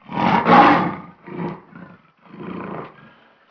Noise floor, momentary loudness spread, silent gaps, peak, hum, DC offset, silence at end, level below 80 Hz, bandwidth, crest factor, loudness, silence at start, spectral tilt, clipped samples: -50 dBFS; 24 LU; none; -2 dBFS; none; under 0.1%; 0.65 s; -56 dBFS; 5.4 kHz; 18 dB; -14 LUFS; 0.1 s; -7.5 dB/octave; under 0.1%